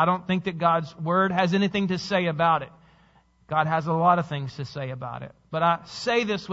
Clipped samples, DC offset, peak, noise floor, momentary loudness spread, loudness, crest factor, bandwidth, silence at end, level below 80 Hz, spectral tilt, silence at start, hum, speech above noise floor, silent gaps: under 0.1%; under 0.1%; -6 dBFS; -60 dBFS; 12 LU; -25 LUFS; 18 dB; 8 kHz; 0 s; -62 dBFS; -6.5 dB/octave; 0 s; none; 35 dB; none